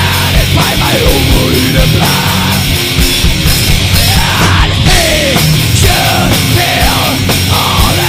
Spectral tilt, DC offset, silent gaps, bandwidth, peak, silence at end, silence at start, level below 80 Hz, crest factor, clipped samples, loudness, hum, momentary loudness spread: -4 dB/octave; under 0.1%; none; 16 kHz; 0 dBFS; 0 s; 0 s; -16 dBFS; 8 dB; 0.8%; -8 LUFS; none; 2 LU